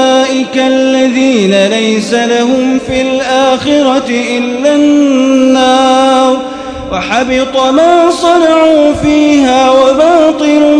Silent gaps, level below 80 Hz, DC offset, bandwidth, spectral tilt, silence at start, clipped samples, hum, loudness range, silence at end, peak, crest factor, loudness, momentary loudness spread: none; -38 dBFS; under 0.1%; 10.5 kHz; -4 dB/octave; 0 s; 1%; none; 3 LU; 0 s; 0 dBFS; 8 dB; -8 LUFS; 5 LU